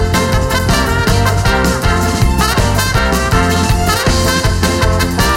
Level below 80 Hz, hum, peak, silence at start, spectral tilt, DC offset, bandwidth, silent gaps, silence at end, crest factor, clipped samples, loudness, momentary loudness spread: -18 dBFS; none; 0 dBFS; 0 s; -4.5 dB/octave; under 0.1%; 16.5 kHz; none; 0 s; 12 dB; under 0.1%; -13 LUFS; 1 LU